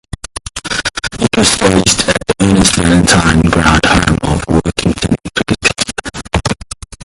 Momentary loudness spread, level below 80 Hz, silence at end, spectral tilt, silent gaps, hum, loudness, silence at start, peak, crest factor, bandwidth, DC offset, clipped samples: 12 LU; -26 dBFS; 0 s; -4 dB/octave; none; none; -11 LUFS; 0.55 s; 0 dBFS; 12 dB; 16 kHz; under 0.1%; under 0.1%